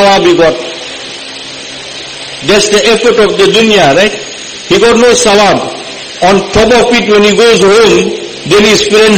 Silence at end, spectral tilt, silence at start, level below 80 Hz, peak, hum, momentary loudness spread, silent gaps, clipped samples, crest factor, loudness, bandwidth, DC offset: 0 s; -3.5 dB/octave; 0 s; -34 dBFS; 0 dBFS; none; 16 LU; none; 2%; 8 dB; -6 LUFS; 16.5 kHz; under 0.1%